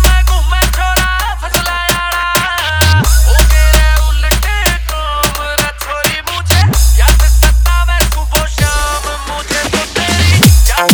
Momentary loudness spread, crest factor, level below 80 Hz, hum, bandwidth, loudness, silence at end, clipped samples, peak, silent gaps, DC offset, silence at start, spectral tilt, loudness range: 6 LU; 10 dB; -12 dBFS; none; over 20 kHz; -11 LUFS; 0 s; under 0.1%; 0 dBFS; none; under 0.1%; 0 s; -3.5 dB/octave; 2 LU